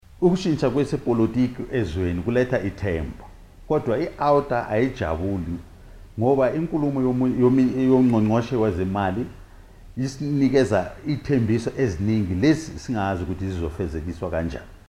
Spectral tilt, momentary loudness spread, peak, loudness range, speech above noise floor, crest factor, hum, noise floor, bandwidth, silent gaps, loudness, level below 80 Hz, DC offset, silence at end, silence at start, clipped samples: -7.5 dB/octave; 10 LU; -6 dBFS; 4 LU; 23 dB; 16 dB; none; -44 dBFS; 11.5 kHz; none; -23 LUFS; -44 dBFS; under 0.1%; 0.15 s; 0.2 s; under 0.1%